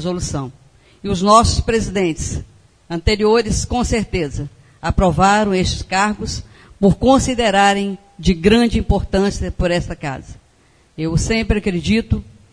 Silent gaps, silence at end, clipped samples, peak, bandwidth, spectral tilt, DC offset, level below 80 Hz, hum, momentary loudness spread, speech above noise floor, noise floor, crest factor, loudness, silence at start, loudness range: none; 0.25 s; under 0.1%; 0 dBFS; 10.5 kHz; -5 dB/octave; under 0.1%; -28 dBFS; none; 13 LU; 37 dB; -53 dBFS; 18 dB; -17 LUFS; 0 s; 4 LU